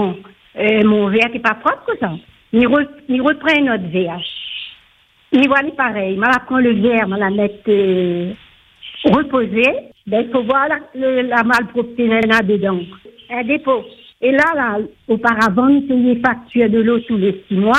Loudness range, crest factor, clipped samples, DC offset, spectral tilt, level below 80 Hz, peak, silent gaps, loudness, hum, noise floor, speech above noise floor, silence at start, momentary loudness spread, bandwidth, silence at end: 2 LU; 16 dB; under 0.1%; under 0.1%; -6.5 dB/octave; -52 dBFS; 0 dBFS; none; -16 LUFS; none; -53 dBFS; 38 dB; 0 s; 10 LU; 10 kHz; 0 s